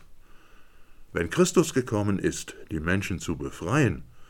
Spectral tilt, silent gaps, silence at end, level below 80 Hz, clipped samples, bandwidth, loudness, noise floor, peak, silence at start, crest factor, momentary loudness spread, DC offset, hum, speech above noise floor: -5.5 dB/octave; none; 0.05 s; -50 dBFS; under 0.1%; 18 kHz; -27 LUFS; -48 dBFS; -6 dBFS; 0 s; 20 dB; 11 LU; under 0.1%; none; 22 dB